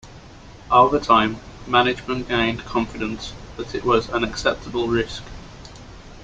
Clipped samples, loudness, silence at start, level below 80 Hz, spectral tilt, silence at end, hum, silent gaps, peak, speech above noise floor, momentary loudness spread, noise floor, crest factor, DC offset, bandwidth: under 0.1%; -21 LUFS; 0.05 s; -42 dBFS; -5 dB/octave; 0 s; none; none; -2 dBFS; 22 dB; 22 LU; -42 dBFS; 20 dB; under 0.1%; 9 kHz